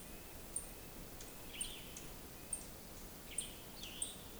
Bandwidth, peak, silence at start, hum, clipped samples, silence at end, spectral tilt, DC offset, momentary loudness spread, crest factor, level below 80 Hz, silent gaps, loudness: over 20 kHz; -28 dBFS; 0 s; none; under 0.1%; 0 s; -2 dB/octave; under 0.1%; 7 LU; 22 dB; -58 dBFS; none; -47 LUFS